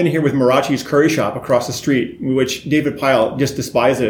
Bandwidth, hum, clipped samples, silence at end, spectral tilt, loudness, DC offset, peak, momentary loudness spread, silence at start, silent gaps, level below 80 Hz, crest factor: 18.5 kHz; none; under 0.1%; 0 s; -5.5 dB/octave; -17 LUFS; under 0.1%; -2 dBFS; 4 LU; 0 s; none; -50 dBFS; 14 dB